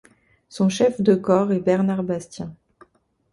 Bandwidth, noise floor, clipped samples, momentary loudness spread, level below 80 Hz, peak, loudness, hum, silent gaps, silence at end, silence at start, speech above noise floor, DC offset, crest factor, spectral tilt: 11.5 kHz; -57 dBFS; under 0.1%; 17 LU; -60 dBFS; -4 dBFS; -20 LUFS; none; none; 0.8 s; 0.5 s; 37 dB; under 0.1%; 18 dB; -7 dB/octave